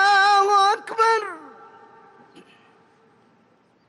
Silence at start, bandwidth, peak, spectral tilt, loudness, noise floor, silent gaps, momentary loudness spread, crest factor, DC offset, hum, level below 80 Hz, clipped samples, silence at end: 0 s; 12 kHz; -8 dBFS; 0 dB/octave; -18 LUFS; -60 dBFS; none; 16 LU; 14 dB; under 0.1%; none; -74 dBFS; under 0.1%; 2.4 s